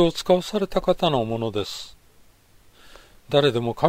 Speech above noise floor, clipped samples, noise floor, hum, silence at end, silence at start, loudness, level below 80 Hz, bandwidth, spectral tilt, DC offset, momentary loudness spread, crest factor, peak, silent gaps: 33 dB; under 0.1%; -54 dBFS; none; 0 s; 0 s; -23 LUFS; -46 dBFS; 16 kHz; -5.5 dB/octave; under 0.1%; 11 LU; 22 dB; -2 dBFS; none